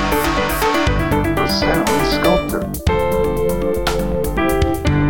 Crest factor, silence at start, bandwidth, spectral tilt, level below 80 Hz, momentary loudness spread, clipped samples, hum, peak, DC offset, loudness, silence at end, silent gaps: 16 dB; 0 s; 19.5 kHz; -5.5 dB/octave; -26 dBFS; 4 LU; under 0.1%; none; -2 dBFS; 2%; -17 LUFS; 0 s; none